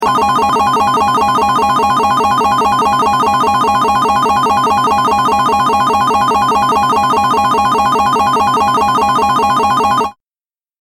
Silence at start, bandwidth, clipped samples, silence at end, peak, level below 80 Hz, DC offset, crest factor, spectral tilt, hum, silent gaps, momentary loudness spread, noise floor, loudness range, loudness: 0 s; 17 kHz; under 0.1%; 0.7 s; -2 dBFS; -40 dBFS; under 0.1%; 10 dB; -4 dB/octave; none; none; 0 LU; under -90 dBFS; 0 LU; -11 LUFS